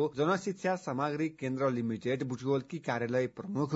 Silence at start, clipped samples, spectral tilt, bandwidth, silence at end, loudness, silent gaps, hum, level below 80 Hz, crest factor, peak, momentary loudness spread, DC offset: 0 s; under 0.1%; -6 dB/octave; 7.6 kHz; 0 s; -33 LUFS; none; none; -72 dBFS; 14 dB; -18 dBFS; 4 LU; under 0.1%